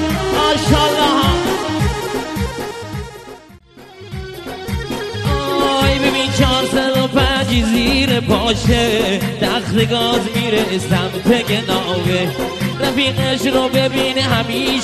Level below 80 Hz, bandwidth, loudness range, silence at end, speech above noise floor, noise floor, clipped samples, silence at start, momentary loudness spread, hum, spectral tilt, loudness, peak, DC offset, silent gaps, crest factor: -30 dBFS; 13.5 kHz; 8 LU; 0 s; 25 dB; -41 dBFS; under 0.1%; 0 s; 10 LU; none; -5 dB/octave; -16 LUFS; 0 dBFS; under 0.1%; none; 16 dB